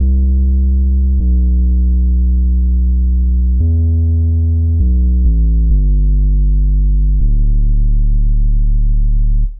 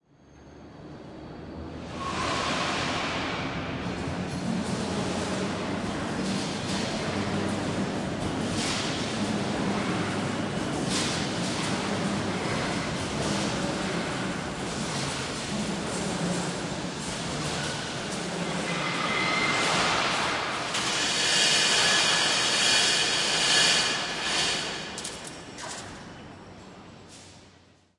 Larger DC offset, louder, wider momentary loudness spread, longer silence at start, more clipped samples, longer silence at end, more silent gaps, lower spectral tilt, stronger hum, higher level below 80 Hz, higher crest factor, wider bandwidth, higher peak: first, 0.9% vs under 0.1%; first, -14 LUFS vs -26 LUFS; second, 3 LU vs 18 LU; second, 0 s vs 0.3 s; neither; second, 0 s vs 0.5 s; neither; first, -19.5 dB/octave vs -3 dB/octave; neither; first, -10 dBFS vs -52 dBFS; second, 6 dB vs 20 dB; second, 0.6 kHz vs 11.5 kHz; first, -4 dBFS vs -10 dBFS